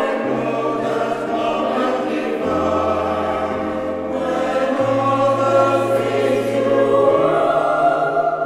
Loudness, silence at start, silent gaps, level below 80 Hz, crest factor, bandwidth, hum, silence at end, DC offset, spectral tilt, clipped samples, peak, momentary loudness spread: -18 LUFS; 0 s; none; -52 dBFS; 16 dB; 13 kHz; none; 0 s; under 0.1%; -6 dB/octave; under 0.1%; -2 dBFS; 6 LU